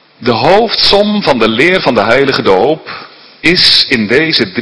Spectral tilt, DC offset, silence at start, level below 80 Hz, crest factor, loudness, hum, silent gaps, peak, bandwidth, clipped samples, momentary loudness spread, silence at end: -4.5 dB/octave; under 0.1%; 0.2 s; -38 dBFS; 10 dB; -8 LUFS; none; none; 0 dBFS; 11 kHz; 2%; 8 LU; 0 s